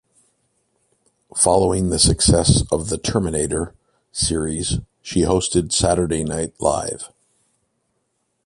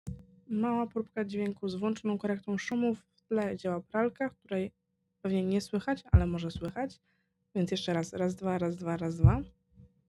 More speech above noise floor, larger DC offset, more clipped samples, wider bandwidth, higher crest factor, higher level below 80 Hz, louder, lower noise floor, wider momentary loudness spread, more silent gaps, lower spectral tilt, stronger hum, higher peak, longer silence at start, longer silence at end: first, 52 dB vs 29 dB; neither; neither; about the same, 11.5 kHz vs 12 kHz; about the same, 20 dB vs 24 dB; first, -34 dBFS vs -44 dBFS; first, -19 LUFS vs -32 LUFS; first, -71 dBFS vs -60 dBFS; about the same, 12 LU vs 10 LU; neither; second, -4.5 dB/octave vs -7.5 dB/octave; neither; first, 0 dBFS vs -8 dBFS; first, 1.35 s vs 0.05 s; first, 1.4 s vs 0.25 s